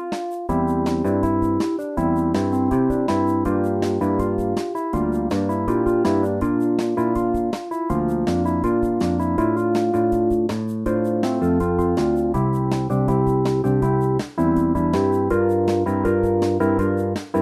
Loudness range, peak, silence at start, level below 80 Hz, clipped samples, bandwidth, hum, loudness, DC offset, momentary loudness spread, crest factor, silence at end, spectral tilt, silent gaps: 2 LU; -6 dBFS; 0 s; -38 dBFS; under 0.1%; 14 kHz; none; -21 LUFS; under 0.1%; 4 LU; 14 dB; 0 s; -8 dB/octave; none